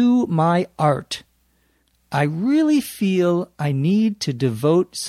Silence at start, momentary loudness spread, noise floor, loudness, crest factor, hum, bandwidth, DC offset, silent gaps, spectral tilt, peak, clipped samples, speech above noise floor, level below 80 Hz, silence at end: 0 s; 6 LU; -63 dBFS; -20 LUFS; 16 dB; none; 15 kHz; under 0.1%; none; -6.5 dB/octave; -4 dBFS; under 0.1%; 44 dB; -60 dBFS; 0 s